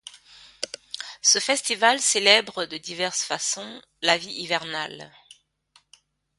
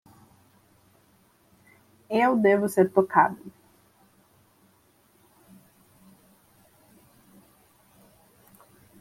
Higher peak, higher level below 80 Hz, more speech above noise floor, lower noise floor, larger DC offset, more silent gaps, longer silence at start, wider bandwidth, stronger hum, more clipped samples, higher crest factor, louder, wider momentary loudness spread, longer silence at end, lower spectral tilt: first, 0 dBFS vs -6 dBFS; about the same, -72 dBFS vs -72 dBFS; about the same, 38 dB vs 41 dB; about the same, -62 dBFS vs -62 dBFS; neither; neither; second, 0.05 s vs 2.1 s; second, 12 kHz vs 16 kHz; neither; neither; about the same, 26 dB vs 24 dB; about the same, -22 LUFS vs -22 LUFS; first, 17 LU vs 14 LU; second, 1.3 s vs 5.5 s; second, 0 dB/octave vs -6.5 dB/octave